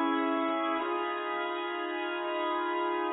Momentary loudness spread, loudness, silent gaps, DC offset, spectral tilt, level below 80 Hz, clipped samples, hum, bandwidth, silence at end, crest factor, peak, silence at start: 4 LU; -31 LUFS; none; under 0.1%; 4 dB/octave; -82 dBFS; under 0.1%; none; 3.9 kHz; 0 s; 14 dB; -18 dBFS; 0 s